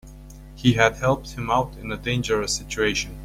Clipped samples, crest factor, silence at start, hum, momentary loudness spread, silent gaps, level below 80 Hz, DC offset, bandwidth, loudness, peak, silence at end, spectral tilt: under 0.1%; 22 dB; 0.05 s; none; 8 LU; none; -40 dBFS; under 0.1%; 16 kHz; -23 LUFS; -2 dBFS; 0 s; -4.5 dB/octave